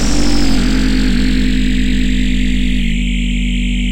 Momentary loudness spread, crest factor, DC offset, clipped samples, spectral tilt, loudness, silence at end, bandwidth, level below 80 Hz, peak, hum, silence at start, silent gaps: 2 LU; 10 dB; 10%; under 0.1%; -5 dB/octave; -16 LUFS; 0 s; 15.5 kHz; -16 dBFS; 0 dBFS; none; 0 s; none